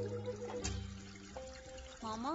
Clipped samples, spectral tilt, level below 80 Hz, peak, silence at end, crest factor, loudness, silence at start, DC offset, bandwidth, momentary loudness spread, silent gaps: under 0.1%; -4.5 dB/octave; -54 dBFS; -24 dBFS; 0 s; 18 dB; -45 LUFS; 0 s; under 0.1%; 8 kHz; 9 LU; none